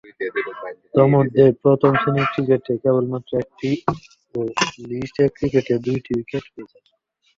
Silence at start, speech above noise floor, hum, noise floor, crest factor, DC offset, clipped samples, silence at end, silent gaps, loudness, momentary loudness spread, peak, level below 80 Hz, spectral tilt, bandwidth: 0.2 s; 46 dB; none; -65 dBFS; 18 dB; under 0.1%; under 0.1%; 0.75 s; none; -20 LUFS; 14 LU; -2 dBFS; -52 dBFS; -6.5 dB/octave; 7.6 kHz